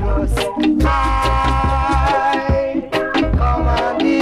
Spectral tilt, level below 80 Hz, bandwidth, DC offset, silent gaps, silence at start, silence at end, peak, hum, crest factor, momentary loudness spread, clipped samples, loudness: -6.5 dB/octave; -20 dBFS; 13 kHz; under 0.1%; none; 0 s; 0 s; -2 dBFS; none; 12 dB; 3 LU; under 0.1%; -17 LUFS